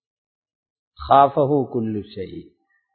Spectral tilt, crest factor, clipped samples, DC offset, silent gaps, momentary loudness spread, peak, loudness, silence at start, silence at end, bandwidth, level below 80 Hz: -11.5 dB/octave; 22 dB; under 0.1%; under 0.1%; none; 21 LU; 0 dBFS; -19 LUFS; 1 s; 0.55 s; 4.5 kHz; -50 dBFS